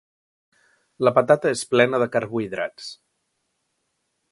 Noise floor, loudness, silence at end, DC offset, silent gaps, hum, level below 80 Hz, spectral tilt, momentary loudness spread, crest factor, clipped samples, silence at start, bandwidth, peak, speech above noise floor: -74 dBFS; -21 LUFS; 1.4 s; under 0.1%; none; none; -68 dBFS; -5 dB/octave; 12 LU; 22 dB; under 0.1%; 1 s; 11.5 kHz; -2 dBFS; 54 dB